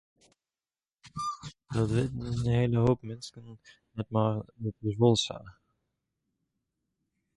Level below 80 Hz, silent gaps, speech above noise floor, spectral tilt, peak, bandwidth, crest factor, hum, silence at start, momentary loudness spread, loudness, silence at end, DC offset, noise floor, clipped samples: -54 dBFS; none; over 61 dB; -6.5 dB/octave; -10 dBFS; 11.5 kHz; 22 dB; none; 1.05 s; 19 LU; -30 LUFS; 1.85 s; under 0.1%; under -90 dBFS; under 0.1%